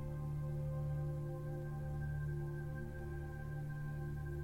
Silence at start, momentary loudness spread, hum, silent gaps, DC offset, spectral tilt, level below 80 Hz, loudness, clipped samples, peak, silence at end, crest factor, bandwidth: 0 s; 5 LU; none; none; under 0.1%; -9 dB/octave; -50 dBFS; -43 LUFS; under 0.1%; -32 dBFS; 0 s; 10 dB; 14 kHz